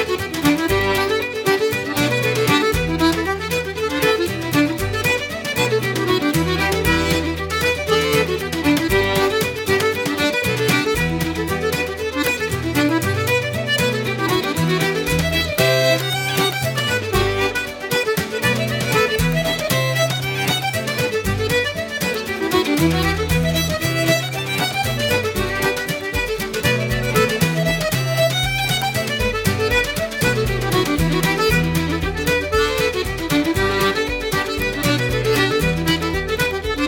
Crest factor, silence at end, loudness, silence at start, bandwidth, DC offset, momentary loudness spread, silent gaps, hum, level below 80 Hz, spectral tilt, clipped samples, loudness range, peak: 16 dB; 0 s; -19 LUFS; 0 s; over 20 kHz; under 0.1%; 4 LU; none; none; -34 dBFS; -4.5 dB/octave; under 0.1%; 1 LU; -2 dBFS